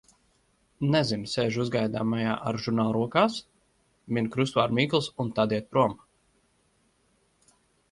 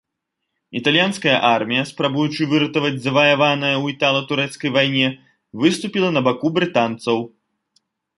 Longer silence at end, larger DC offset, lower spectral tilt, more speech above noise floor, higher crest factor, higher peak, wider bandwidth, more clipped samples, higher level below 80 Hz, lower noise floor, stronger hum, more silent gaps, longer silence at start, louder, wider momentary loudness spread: first, 1.95 s vs 0.9 s; neither; about the same, -6 dB/octave vs -5 dB/octave; second, 42 dB vs 60 dB; about the same, 22 dB vs 18 dB; second, -6 dBFS vs -2 dBFS; about the same, 11.5 kHz vs 11.5 kHz; neither; about the same, -62 dBFS vs -64 dBFS; second, -68 dBFS vs -79 dBFS; neither; neither; about the same, 0.8 s vs 0.7 s; second, -27 LUFS vs -18 LUFS; about the same, 6 LU vs 7 LU